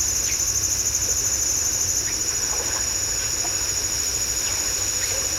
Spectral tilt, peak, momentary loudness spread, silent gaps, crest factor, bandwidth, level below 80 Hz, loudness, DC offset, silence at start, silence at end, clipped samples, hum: 0 dB/octave; -10 dBFS; 2 LU; none; 14 dB; 16 kHz; -40 dBFS; -20 LUFS; under 0.1%; 0 s; 0 s; under 0.1%; none